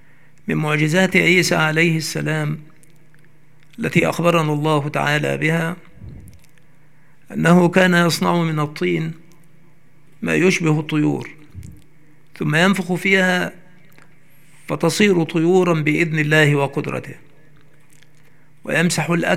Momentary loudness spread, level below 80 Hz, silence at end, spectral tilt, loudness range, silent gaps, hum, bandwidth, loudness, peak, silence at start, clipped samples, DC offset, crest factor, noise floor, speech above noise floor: 14 LU; -58 dBFS; 0 s; -5.5 dB/octave; 3 LU; none; none; 16 kHz; -17 LUFS; 0 dBFS; 0.45 s; under 0.1%; 0.8%; 18 dB; -54 dBFS; 37 dB